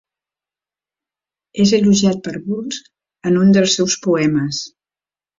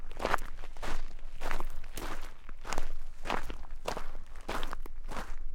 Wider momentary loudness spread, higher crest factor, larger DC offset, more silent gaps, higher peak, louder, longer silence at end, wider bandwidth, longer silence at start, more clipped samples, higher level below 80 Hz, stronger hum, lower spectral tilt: first, 15 LU vs 12 LU; second, 16 dB vs 22 dB; neither; neither; first, -2 dBFS vs -8 dBFS; first, -16 LUFS vs -41 LUFS; first, 0.7 s vs 0 s; second, 7.6 kHz vs 11 kHz; first, 1.55 s vs 0 s; neither; second, -54 dBFS vs -36 dBFS; neither; about the same, -5 dB/octave vs -4 dB/octave